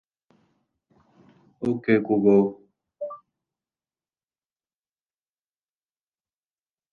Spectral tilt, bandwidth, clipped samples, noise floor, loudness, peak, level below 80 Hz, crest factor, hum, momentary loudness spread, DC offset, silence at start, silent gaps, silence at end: -9.5 dB/octave; 4.5 kHz; under 0.1%; under -90 dBFS; -22 LUFS; -6 dBFS; -68 dBFS; 22 dB; none; 18 LU; under 0.1%; 1.6 s; none; 3.75 s